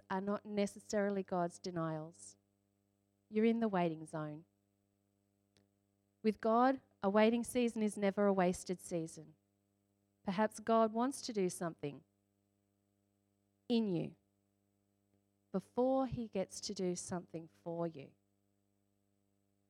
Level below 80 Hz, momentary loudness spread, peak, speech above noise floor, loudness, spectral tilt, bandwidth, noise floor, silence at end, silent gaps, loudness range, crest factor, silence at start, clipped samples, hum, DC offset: -74 dBFS; 15 LU; -18 dBFS; 44 dB; -37 LUFS; -5.5 dB/octave; 13.5 kHz; -81 dBFS; 1.65 s; none; 9 LU; 20 dB; 0.1 s; under 0.1%; 50 Hz at -70 dBFS; under 0.1%